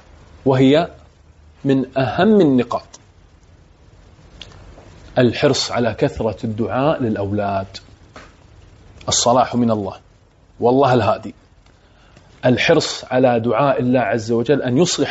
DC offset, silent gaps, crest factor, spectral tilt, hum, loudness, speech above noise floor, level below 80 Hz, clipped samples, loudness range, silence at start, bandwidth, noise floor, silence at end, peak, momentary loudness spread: under 0.1%; none; 16 dB; -5 dB/octave; none; -17 LUFS; 34 dB; -46 dBFS; under 0.1%; 4 LU; 0.45 s; 8 kHz; -50 dBFS; 0 s; -2 dBFS; 11 LU